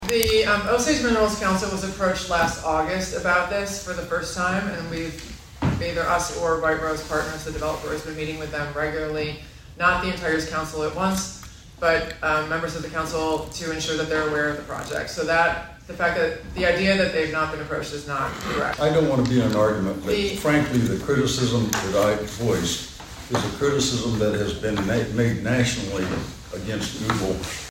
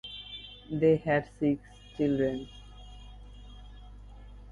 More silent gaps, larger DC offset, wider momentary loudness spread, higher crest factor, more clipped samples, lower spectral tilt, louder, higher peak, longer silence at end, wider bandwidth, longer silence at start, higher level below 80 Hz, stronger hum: neither; neither; second, 9 LU vs 25 LU; about the same, 22 dB vs 20 dB; neither; second, -4.5 dB/octave vs -8 dB/octave; first, -23 LUFS vs -30 LUFS; first, -2 dBFS vs -12 dBFS; about the same, 0 s vs 0 s; first, 16.5 kHz vs 10.5 kHz; about the same, 0 s vs 0.05 s; first, -42 dBFS vs -50 dBFS; second, none vs 50 Hz at -50 dBFS